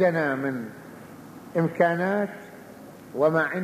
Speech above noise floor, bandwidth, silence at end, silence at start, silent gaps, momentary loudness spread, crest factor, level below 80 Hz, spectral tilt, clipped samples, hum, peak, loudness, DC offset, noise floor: 21 dB; 15 kHz; 0 s; 0 s; none; 22 LU; 18 dB; -70 dBFS; -7.5 dB/octave; under 0.1%; none; -8 dBFS; -25 LUFS; under 0.1%; -44 dBFS